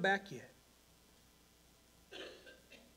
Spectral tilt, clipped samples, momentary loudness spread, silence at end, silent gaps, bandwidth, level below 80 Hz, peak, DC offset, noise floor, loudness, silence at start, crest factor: -4 dB/octave; under 0.1%; 24 LU; 0.15 s; none; 16 kHz; -74 dBFS; -22 dBFS; under 0.1%; -67 dBFS; -43 LUFS; 0 s; 24 dB